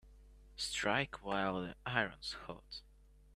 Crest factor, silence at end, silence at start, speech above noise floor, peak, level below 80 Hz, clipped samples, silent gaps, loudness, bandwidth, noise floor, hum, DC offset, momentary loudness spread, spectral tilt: 26 dB; 0 s; 0.05 s; 20 dB; -16 dBFS; -60 dBFS; under 0.1%; none; -38 LUFS; 14 kHz; -60 dBFS; none; under 0.1%; 15 LU; -3.5 dB/octave